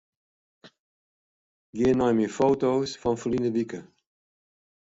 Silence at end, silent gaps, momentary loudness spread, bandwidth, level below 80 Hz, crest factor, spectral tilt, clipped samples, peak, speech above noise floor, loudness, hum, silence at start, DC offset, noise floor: 1.15 s; 0.79-1.73 s; 11 LU; 8 kHz; -58 dBFS; 18 dB; -6.5 dB/octave; under 0.1%; -10 dBFS; over 66 dB; -25 LUFS; none; 0.65 s; under 0.1%; under -90 dBFS